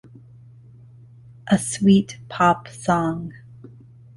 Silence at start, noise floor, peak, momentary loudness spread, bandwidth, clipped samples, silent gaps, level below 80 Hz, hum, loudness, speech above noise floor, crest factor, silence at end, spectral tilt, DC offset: 1.45 s; -46 dBFS; -4 dBFS; 15 LU; 11.5 kHz; under 0.1%; none; -52 dBFS; none; -21 LUFS; 26 dB; 20 dB; 0.5 s; -5.5 dB/octave; under 0.1%